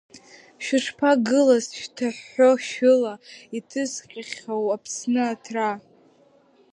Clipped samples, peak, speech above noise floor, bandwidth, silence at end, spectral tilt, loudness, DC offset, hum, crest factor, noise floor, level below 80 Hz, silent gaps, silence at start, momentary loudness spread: under 0.1%; -6 dBFS; 35 dB; 11 kHz; 0.95 s; -3.5 dB/octave; -23 LUFS; under 0.1%; none; 18 dB; -58 dBFS; -76 dBFS; none; 0.15 s; 16 LU